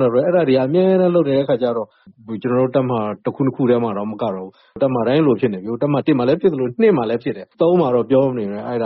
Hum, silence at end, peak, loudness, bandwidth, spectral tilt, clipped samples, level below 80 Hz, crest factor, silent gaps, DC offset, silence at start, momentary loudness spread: none; 0 s; -4 dBFS; -18 LUFS; 5.4 kHz; -7 dB/octave; under 0.1%; -58 dBFS; 14 dB; none; under 0.1%; 0 s; 9 LU